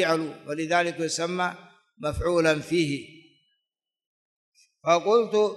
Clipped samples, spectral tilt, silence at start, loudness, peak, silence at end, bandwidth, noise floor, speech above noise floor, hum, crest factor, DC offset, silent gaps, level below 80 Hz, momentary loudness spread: under 0.1%; -4.5 dB/octave; 0 s; -25 LUFS; -8 dBFS; 0 s; 12 kHz; -85 dBFS; 61 dB; none; 18 dB; under 0.1%; 4.07-4.52 s; -50 dBFS; 12 LU